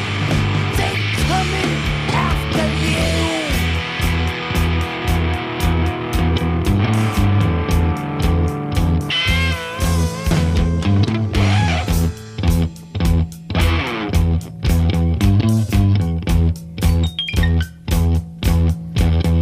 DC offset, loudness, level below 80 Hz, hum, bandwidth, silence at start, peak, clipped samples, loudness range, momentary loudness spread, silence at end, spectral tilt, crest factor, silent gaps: under 0.1%; -18 LUFS; -24 dBFS; none; 15.5 kHz; 0 s; -4 dBFS; under 0.1%; 2 LU; 4 LU; 0 s; -6 dB/octave; 12 dB; none